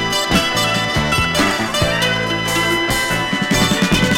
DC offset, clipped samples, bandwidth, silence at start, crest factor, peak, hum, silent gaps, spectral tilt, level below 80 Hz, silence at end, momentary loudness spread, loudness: under 0.1%; under 0.1%; 18.5 kHz; 0 s; 16 dB; -2 dBFS; none; none; -3.5 dB/octave; -32 dBFS; 0 s; 2 LU; -16 LUFS